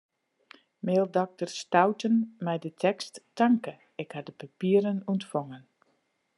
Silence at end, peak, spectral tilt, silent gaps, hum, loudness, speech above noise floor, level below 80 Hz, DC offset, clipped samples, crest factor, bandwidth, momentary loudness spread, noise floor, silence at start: 0.8 s; -6 dBFS; -6.5 dB/octave; none; none; -28 LUFS; 46 dB; -82 dBFS; under 0.1%; under 0.1%; 22 dB; 11.5 kHz; 15 LU; -73 dBFS; 0.85 s